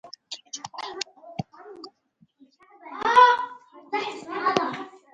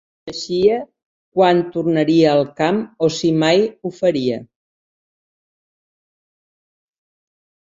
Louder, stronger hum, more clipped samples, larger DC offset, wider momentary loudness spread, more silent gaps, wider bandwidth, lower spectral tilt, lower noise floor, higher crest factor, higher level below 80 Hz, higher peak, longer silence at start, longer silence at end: second, -23 LUFS vs -17 LUFS; neither; neither; neither; first, 24 LU vs 11 LU; second, none vs 1.05-1.32 s; first, 9.2 kHz vs 7.8 kHz; second, -3 dB/octave vs -6 dB/octave; second, -64 dBFS vs under -90 dBFS; first, 24 dB vs 18 dB; second, -70 dBFS vs -60 dBFS; about the same, -4 dBFS vs -2 dBFS; second, 0.05 s vs 0.25 s; second, 0.25 s vs 3.3 s